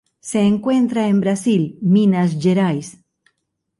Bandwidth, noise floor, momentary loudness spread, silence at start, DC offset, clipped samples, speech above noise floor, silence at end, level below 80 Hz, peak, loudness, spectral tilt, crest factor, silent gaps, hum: 11.5 kHz; -73 dBFS; 7 LU; 0.25 s; under 0.1%; under 0.1%; 56 dB; 0.9 s; -60 dBFS; -6 dBFS; -17 LUFS; -7 dB/octave; 12 dB; none; none